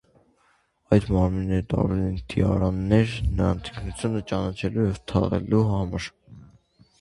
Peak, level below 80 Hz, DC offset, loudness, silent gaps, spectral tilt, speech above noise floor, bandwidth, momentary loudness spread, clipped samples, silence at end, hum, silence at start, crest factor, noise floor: -4 dBFS; -36 dBFS; under 0.1%; -25 LUFS; none; -8 dB/octave; 42 dB; 11 kHz; 8 LU; under 0.1%; 0.55 s; none; 0.9 s; 20 dB; -65 dBFS